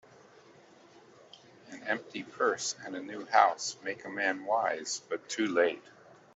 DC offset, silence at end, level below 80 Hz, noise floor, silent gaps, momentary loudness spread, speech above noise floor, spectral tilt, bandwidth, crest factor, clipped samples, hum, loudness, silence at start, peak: under 0.1%; 0.55 s; -84 dBFS; -58 dBFS; none; 15 LU; 26 dB; -2 dB/octave; 8.2 kHz; 24 dB; under 0.1%; none; -31 LUFS; 1.35 s; -8 dBFS